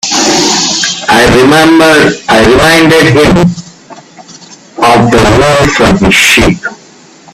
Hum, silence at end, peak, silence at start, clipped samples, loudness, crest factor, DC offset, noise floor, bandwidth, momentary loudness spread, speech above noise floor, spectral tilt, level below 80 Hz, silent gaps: none; 0.6 s; 0 dBFS; 0.05 s; 0.9%; -5 LUFS; 6 dB; under 0.1%; -35 dBFS; 17.5 kHz; 6 LU; 31 dB; -4 dB/octave; -26 dBFS; none